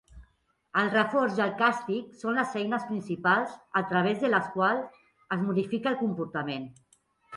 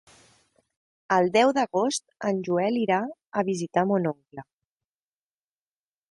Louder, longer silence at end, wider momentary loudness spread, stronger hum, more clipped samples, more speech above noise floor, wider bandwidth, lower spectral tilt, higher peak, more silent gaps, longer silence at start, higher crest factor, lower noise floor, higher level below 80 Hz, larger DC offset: second, -28 LUFS vs -25 LUFS; second, 0 s vs 1.7 s; about the same, 8 LU vs 10 LU; neither; neither; second, 41 dB vs over 65 dB; about the same, 11.5 kHz vs 11.5 kHz; first, -6.5 dB/octave vs -5 dB/octave; about the same, -10 dBFS vs -8 dBFS; neither; second, 0.15 s vs 1.1 s; about the same, 18 dB vs 20 dB; second, -69 dBFS vs under -90 dBFS; first, -64 dBFS vs -70 dBFS; neither